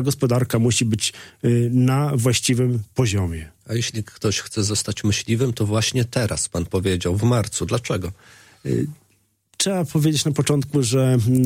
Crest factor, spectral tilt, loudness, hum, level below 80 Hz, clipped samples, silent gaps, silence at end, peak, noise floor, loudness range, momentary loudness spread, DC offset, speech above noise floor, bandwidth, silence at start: 16 dB; -5 dB/octave; -21 LUFS; none; -46 dBFS; under 0.1%; none; 0 s; -6 dBFS; -63 dBFS; 4 LU; 7 LU; under 0.1%; 43 dB; 16.5 kHz; 0 s